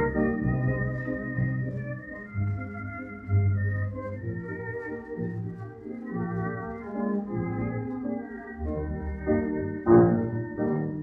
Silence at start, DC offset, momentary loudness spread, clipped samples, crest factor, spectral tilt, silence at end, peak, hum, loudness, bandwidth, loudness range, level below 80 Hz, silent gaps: 0 s; under 0.1%; 11 LU; under 0.1%; 20 dB; -12 dB/octave; 0 s; -8 dBFS; none; -29 LUFS; 2.7 kHz; 7 LU; -46 dBFS; none